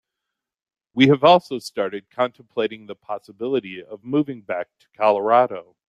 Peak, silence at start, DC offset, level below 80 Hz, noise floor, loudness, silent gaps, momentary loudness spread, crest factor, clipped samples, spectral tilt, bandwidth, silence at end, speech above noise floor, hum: -2 dBFS; 0.95 s; under 0.1%; -68 dBFS; -84 dBFS; -20 LUFS; none; 17 LU; 20 dB; under 0.1%; -6.5 dB/octave; 12.5 kHz; 0.25 s; 63 dB; none